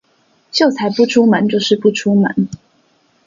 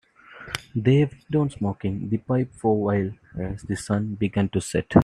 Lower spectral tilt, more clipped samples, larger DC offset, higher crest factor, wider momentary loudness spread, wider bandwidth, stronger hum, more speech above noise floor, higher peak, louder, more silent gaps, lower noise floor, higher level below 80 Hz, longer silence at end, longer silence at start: second, -5.5 dB/octave vs -7 dB/octave; neither; neither; second, 14 dB vs 22 dB; second, 8 LU vs 12 LU; second, 7.4 kHz vs 13 kHz; neither; first, 44 dB vs 21 dB; about the same, 0 dBFS vs -2 dBFS; first, -14 LUFS vs -25 LUFS; neither; first, -57 dBFS vs -44 dBFS; second, -58 dBFS vs -50 dBFS; first, 0.7 s vs 0 s; first, 0.55 s vs 0.3 s